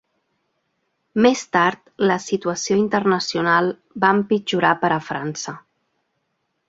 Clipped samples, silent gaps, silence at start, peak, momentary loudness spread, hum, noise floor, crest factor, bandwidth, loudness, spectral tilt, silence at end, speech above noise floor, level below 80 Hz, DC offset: under 0.1%; none; 1.15 s; 0 dBFS; 10 LU; none; -73 dBFS; 20 dB; 8 kHz; -20 LUFS; -4.5 dB/octave; 1.1 s; 54 dB; -62 dBFS; under 0.1%